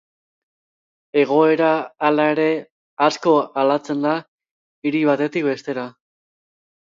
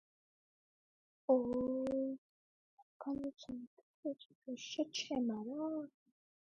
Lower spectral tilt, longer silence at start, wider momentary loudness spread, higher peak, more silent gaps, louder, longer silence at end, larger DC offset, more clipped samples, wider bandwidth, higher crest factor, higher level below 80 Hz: first, -6 dB/octave vs -4.5 dB/octave; second, 1.15 s vs 1.3 s; second, 11 LU vs 15 LU; first, -2 dBFS vs -20 dBFS; second, 2.70-2.97 s, 4.28-4.38 s, 4.51-4.82 s vs 2.18-3.00 s, 3.67-3.77 s, 3.83-4.03 s, 4.35-4.42 s; first, -19 LUFS vs -40 LUFS; first, 0.95 s vs 0.7 s; neither; neither; about the same, 7.6 kHz vs 7.6 kHz; about the same, 18 dB vs 22 dB; about the same, -74 dBFS vs -74 dBFS